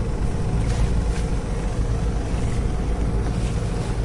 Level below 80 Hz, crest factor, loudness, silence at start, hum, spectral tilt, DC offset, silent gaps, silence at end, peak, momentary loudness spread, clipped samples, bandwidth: -24 dBFS; 14 dB; -25 LUFS; 0 s; none; -7 dB/octave; under 0.1%; none; 0 s; -8 dBFS; 3 LU; under 0.1%; 11.5 kHz